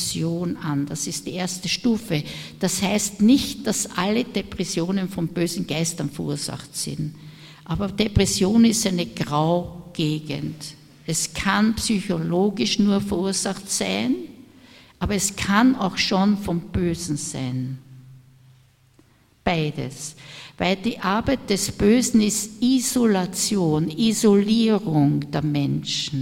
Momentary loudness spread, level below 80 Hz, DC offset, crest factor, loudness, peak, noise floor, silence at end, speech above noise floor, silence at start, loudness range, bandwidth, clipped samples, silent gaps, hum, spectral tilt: 12 LU; -44 dBFS; under 0.1%; 18 dB; -22 LUFS; -4 dBFS; -56 dBFS; 0 s; 34 dB; 0 s; 7 LU; 16.5 kHz; under 0.1%; none; none; -4.5 dB/octave